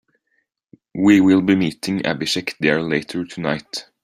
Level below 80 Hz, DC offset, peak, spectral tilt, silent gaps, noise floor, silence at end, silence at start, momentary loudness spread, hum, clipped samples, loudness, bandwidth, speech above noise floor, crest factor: -56 dBFS; under 0.1%; -2 dBFS; -5.5 dB/octave; none; -70 dBFS; 0.2 s; 0.95 s; 13 LU; none; under 0.1%; -18 LUFS; 13.5 kHz; 52 dB; 18 dB